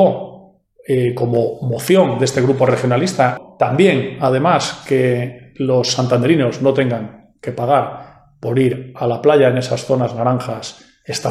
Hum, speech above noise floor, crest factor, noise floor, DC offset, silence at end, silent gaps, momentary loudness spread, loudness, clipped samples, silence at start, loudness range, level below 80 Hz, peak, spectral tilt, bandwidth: none; 30 dB; 16 dB; -45 dBFS; under 0.1%; 0 s; none; 14 LU; -16 LUFS; under 0.1%; 0 s; 2 LU; -56 dBFS; 0 dBFS; -6 dB/octave; 14.5 kHz